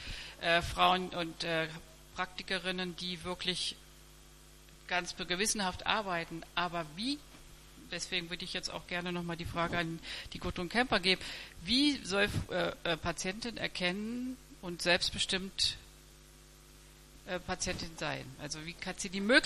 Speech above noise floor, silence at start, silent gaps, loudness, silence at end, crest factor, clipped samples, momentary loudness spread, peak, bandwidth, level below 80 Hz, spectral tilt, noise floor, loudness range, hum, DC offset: 22 dB; 0 s; none; -34 LUFS; 0 s; 24 dB; under 0.1%; 13 LU; -12 dBFS; 14.5 kHz; -54 dBFS; -3 dB/octave; -57 dBFS; 6 LU; none; under 0.1%